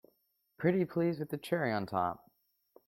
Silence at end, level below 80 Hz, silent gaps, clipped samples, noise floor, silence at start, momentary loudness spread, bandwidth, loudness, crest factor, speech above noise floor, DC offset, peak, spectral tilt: 0.7 s; -72 dBFS; none; under 0.1%; -77 dBFS; 0.6 s; 6 LU; 16 kHz; -34 LUFS; 20 dB; 44 dB; under 0.1%; -16 dBFS; -7.5 dB/octave